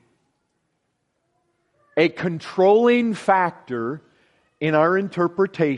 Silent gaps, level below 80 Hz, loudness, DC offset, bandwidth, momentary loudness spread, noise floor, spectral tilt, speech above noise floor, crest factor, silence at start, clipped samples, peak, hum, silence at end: none; -68 dBFS; -20 LUFS; under 0.1%; 11 kHz; 12 LU; -73 dBFS; -7 dB/octave; 54 dB; 18 dB; 1.95 s; under 0.1%; -4 dBFS; none; 0 s